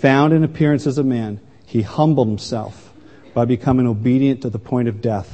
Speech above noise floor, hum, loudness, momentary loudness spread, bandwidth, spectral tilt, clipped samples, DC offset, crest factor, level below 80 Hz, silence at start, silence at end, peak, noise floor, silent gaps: 27 dB; none; -18 LUFS; 10 LU; 8.6 kHz; -8 dB/octave; under 0.1%; 0.4%; 18 dB; -48 dBFS; 0 s; 0.05 s; 0 dBFS; -44 dBFS; none